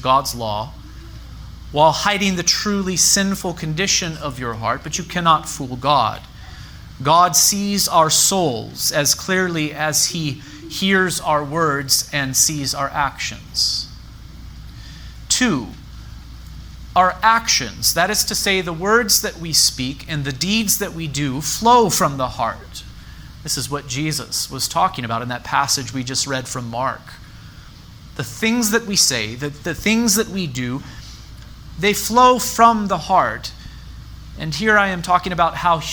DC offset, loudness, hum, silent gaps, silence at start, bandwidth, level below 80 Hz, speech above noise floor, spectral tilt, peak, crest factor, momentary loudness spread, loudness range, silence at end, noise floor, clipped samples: under 0.1%; -17 LUFS; none; none; 0 s; over 20 kHz; -40 dBFS; 21 dB; -2.5 dB/octave; 0 dBFS; 20 dB; 24 LU; 6 LU; 0 s; -40 dBFS; under 0.1%